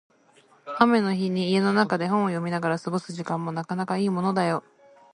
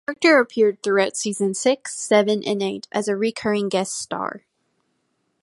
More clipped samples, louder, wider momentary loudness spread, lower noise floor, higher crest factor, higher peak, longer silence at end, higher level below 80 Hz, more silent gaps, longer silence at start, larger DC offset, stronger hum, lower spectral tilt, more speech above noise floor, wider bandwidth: neither; second, -25 LUFS vs -21 LUFS; about the same, 9 LU vs 10 LU; second, -58 dBFS vs -71 dBFS; about the same, 22 dB vs 18 dB; about the same, -2 dBFS vs -4 dBFS; second, 0.55 s vs 1.05 s; about the same, -70 dBFS vs -68 dBFS; neither; first, 0.65 s vs 0.1 s; neither; neither; first, -6.5 dB/octave vs -3.5 dB/octave; second, 34 dB vs 50 dB; about the same, 11 kHz vs 11.5 kHz